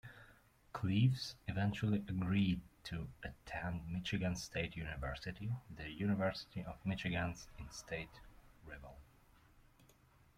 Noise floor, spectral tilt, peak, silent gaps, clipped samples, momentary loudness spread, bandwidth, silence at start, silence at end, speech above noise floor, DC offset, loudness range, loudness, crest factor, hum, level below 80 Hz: -68 dBFS; -6 dB/octave; -22 dBFS; none; under 0.1%; 16 LU; 15.5 kHz; 0.05 s; 1.35 s; 28 dB; under 0.1%; 7 LU; -41 LUFS; 20 dB; none; -58 dBFS